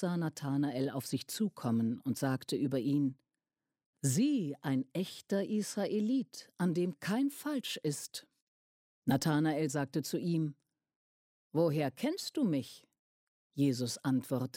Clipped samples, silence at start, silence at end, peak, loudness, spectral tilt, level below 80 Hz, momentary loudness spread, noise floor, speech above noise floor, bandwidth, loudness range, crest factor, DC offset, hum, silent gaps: under 0.1%; 0 s; 0.1 s; -18 dBFS; -34 LUFS; -5.5 dB/octave; -76 dBFS; 7 LU; under -90 dBFS; over 56 dB; 16.5 kHz; 2 LU; 16 dB; under 0.1%; none; 3.86-3.93 s, 8.42-9.02 s, 10.96-11.51 s, 12.99-13.50 s